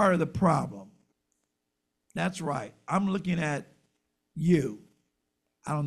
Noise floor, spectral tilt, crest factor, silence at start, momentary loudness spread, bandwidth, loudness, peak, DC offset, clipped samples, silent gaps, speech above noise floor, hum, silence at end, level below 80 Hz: -82 dBFS; -7 dB/octave; 20 dB; 0 s; 17 LU; 12 kHz; -29 LUFS; -10 dBFS; under 0.1%; under 0.1%; none; 55 dB; none; 0 s; -60 dBFS